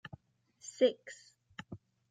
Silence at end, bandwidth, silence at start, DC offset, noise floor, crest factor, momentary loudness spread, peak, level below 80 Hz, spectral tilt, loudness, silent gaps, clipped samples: 0.35 s; 9.4 kHz; 0.65 s; under 0.1%; -65 dBFS; 22 dB; 22 LU; -16 dBFS; -76 dBFS; -4 dB/octave; -32 LUFS; none; under 0.1%